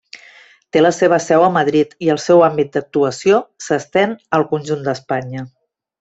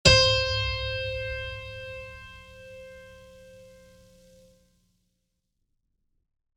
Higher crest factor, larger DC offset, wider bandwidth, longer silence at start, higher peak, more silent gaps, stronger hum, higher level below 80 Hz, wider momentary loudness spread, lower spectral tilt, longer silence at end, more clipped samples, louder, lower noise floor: second, 14 dB vs 26 dB; neither; second, 8.2 kHz vs 13 kHz; about the same, 0.15 s vs 0.05 s; about the same, -2 dBFS vs -4 dBFS; neither; neither; second, -60 dBFS vs -42 dBFS; second, 10 LU vs 26 LU; first, -5.5 dB/octave vs -3 dB/octave; second, 0.55 s vs 2.95 s; neither; first, -16 LUFS vs -25 LUFS; second, -46 dBFS vs -78 dBFS